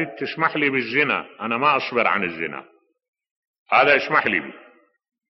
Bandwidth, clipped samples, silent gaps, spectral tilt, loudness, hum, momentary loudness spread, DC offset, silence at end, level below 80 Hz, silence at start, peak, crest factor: 6 kHz; under 0.1%; 3.08-3.13 s, 3.31-3.66 s; -1.5 dB/octave; -20 LUFS; none; 12 LU; under 0.1%; 0.7 s; -68 dBFS; 0 s; -4 dBFS; 20 dB